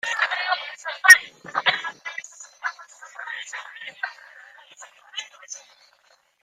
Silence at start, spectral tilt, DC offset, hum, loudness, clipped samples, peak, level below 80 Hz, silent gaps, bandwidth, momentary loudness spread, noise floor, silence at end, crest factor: 0.05 s; 2 dB/octave; under 0.1%; none; -19 LUFS; under 0.1%; 0 dBFS; -74 dBFS; none; 15.5 kHz; 26 LU; -61 dBFS; 0.85 s; 26 dB